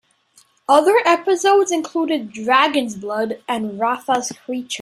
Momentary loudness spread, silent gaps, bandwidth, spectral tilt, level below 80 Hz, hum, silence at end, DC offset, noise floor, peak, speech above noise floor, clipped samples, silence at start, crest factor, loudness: 10 LU; none; 14.5 kHz; -3 dB/octave; -68 dBFS; none; 0 s; under 0.1%; -56 dBFS; -2 dBFS; 38 dB; under 0.1%; 0.7 s; 18 dB; -18 LUFS